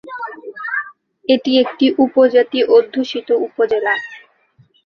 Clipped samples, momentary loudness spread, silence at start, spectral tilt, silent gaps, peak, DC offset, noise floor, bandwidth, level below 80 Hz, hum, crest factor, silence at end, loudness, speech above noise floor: under 0.1%; 16 LU; 0.05 s; -5 dB/octave; none; -2 dBFS; under 0.1%; -54 dBFS; 6.8 kHz; -64 dBFS; none; 14 dB; 0.65 s; -15 LUFS; 40 dB